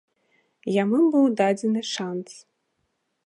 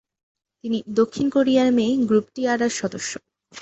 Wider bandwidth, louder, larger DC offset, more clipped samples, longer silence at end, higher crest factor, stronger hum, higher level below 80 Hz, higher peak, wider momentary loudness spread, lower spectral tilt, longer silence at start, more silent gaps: first, 11 kHz vs 8.2 kHz; about the same, -22 LUFS vs -21 LUFS; neither; neither; first, 0.85 s vs 0 s; about the same, 16 dB vs 16 dB; neither; second, -80 dBFS vs -62 dBFS; about the same, -8 dBFS vs -6 dBFS; first, 15 LU vs 12 LU; about the same, -5.5 dB/octave vs -4.5 dB/octave; about the same, 0.65 s vs 0.65 s; neither